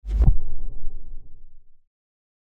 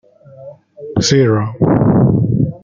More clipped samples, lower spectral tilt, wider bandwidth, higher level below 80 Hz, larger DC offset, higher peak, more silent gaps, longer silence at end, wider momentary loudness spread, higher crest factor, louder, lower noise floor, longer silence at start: neither; first, -10 dB/octave vs -6.5 dB/octave; second, 1.4 kHz vs 7.6 kHz; first, -24 dBFS vs -40 dBFS; neither; about the same, -4 dBFS vs -2 dBFS; neither; first, 0.7 s vs 0.05 s; first, 25 LU vs 7 LU; about the same, 16 dB vs 12 dB; second, -26 LUFS vs -13 LUFS; about the same, -38 dBFS vs -36 dBFS; second, 0.05 s vs 0.4 s